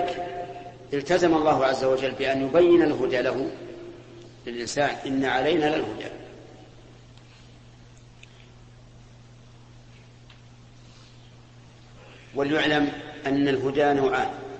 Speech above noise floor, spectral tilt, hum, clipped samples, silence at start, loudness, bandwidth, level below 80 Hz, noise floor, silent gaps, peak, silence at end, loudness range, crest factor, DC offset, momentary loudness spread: 26 dB; -5.5 dB/octave; none; under 0.1%; 0 s; -24 LUFS; 8.6 kHz; -56 dBFS; -49 dBFS; none; -8 dBFS; 0 s; 10 LU; 18 dB; under 0.1%; 20 LU